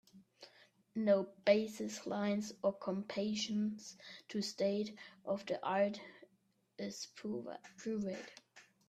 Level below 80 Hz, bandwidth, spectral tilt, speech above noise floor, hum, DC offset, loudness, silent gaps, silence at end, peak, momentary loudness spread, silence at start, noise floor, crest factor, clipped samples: -82 dBFS; 14 kHz; -5 dB/octave; 39 dB; none; under 0.1%; -38 LUFS; none; 0.3 s; -18 dBFS; 17 LU; 0.15 s; -77 dBFS; 22 dB; under 0.1%